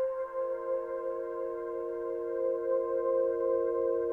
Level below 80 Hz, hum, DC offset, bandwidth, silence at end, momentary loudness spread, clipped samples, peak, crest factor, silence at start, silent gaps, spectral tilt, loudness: -68 dBFS; 50 Hz at -75 dBFS; under 0.1%; 2.9 kHz; 0 s; 7 LU; under 0.1%; -18 dBFS; 12 dB; 0 s; none; -8.5 dB/octave; -32 LUFS